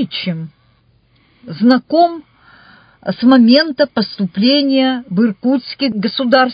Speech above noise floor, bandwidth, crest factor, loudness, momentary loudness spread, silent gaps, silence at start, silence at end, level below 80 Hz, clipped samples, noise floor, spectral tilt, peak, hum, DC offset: 41 dB; 5.2 kHz; 14 dB; -14 LUFS; 15 LU; none; 0 s; 0 s; -60 dBFS; under 0.1%; -54 dBFS; -8 dB/octave; 0 dBFS; none; under 0.1%